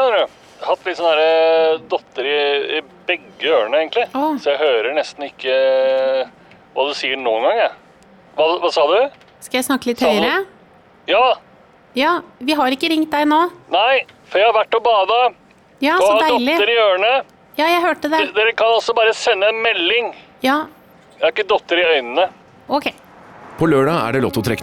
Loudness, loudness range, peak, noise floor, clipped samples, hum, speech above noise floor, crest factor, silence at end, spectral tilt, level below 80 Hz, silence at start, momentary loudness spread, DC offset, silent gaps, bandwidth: -17 LUFS; 3 LU; -6 dBFS; -48 dBFS; under 0.1%; none; 32 dB; 12 dB; 0 s; -4 dB/octave; -58 dBFS; 0 s; 8 LU; under 0.1%; none; 17.5 kHz